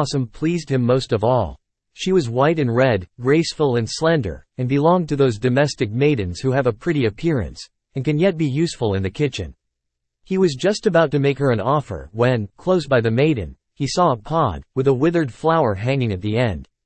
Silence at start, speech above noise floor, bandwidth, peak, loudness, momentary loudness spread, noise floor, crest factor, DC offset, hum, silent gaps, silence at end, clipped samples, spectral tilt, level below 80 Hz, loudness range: 0 s; 59 dB; 8.8 kHz; -4 dBFS; -19 LUFS; 7 LU; -78 dBFS; 16 dB; under 0.1%; none; none; 0.2 s; under 0.1%; -6.5 dB/octave; -46 dBFS; 3 LU